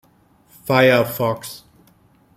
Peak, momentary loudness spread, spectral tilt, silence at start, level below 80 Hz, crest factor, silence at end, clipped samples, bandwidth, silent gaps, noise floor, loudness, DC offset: -2 dBFS; 21 LU; -5.5 dB/octave; 0.65 s; -60 dBFS; 18 dB; 0.8 s; under 0.1%; 16 kHz; none; -55 dBFS; -17 LUFS; under 0.1%